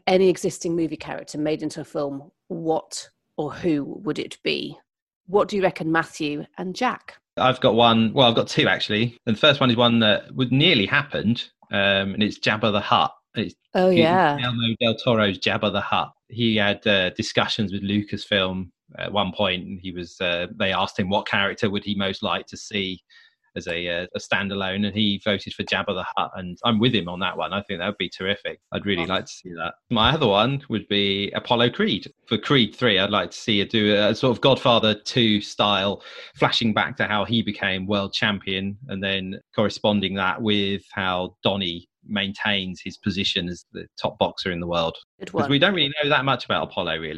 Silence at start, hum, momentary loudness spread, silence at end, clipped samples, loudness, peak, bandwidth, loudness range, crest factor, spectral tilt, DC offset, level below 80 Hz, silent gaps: 0.05 s; none; 12 LU; 0 s; under 0.1%; -22 LUFS; -2 dBFS; 12 kHz; 6 LU; 22 dB; -5 dB/octave; under 0.1%; -56 dBFS; 5.02-5.07 s, 5.16-5.24 s, 45.04-45.18 s